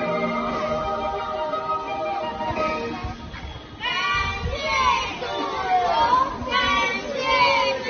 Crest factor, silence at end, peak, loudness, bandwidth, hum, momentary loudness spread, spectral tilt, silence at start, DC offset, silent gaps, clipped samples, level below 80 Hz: 16 dB; 0 s; -8 dBFS; -23 LUFS; 6.6 kHz; none; 10 LU; -1.5 dB/octave; 0 s; under 0.1%; none; under 0.1%; -42 dBFS